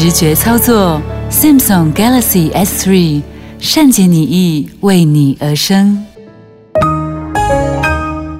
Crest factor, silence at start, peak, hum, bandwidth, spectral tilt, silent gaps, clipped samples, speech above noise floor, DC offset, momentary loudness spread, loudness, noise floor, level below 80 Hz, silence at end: 10 dB; 0 s; 0 dBFS; none; 16.5 kHz; -5 dB/octave; none; under 0.1%; 28 dB; under 0.1%; 10 LU; -10 LUFS; -37 dBFS; -28 dBFS; 0 s